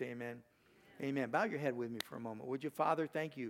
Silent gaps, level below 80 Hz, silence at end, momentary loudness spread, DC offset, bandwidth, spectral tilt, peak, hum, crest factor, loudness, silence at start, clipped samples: none; -86 dBFS; 0 s; 10 LU; under 0.1%; 18 kHz; -6 dB/octave; -20 dBFS; none; 20 dB; -40 LUFS; 0 s; under 0.1%